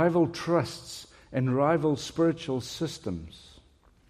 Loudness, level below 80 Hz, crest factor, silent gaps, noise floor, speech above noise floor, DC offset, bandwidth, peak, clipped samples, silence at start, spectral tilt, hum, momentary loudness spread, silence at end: -28 LUFS; -58 dBFS; 16 dB; none; -60 dBFS; 33 dB; under 0.1%; 14.5 kHz; -12 dBFS; under 0.1%; 0 s; -6 dB/octave; none; 15 LU; 0.7 s